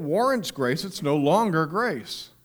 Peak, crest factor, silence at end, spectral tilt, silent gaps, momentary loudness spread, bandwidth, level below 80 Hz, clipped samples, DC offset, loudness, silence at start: -8 dBFS; 16 dB; 0.15 s; -5.5 dB/octave; none; 7 LU; over 20 kHz; -64 dBFS; under 0.1%; under 0.1%; -24 LUFS; 0 s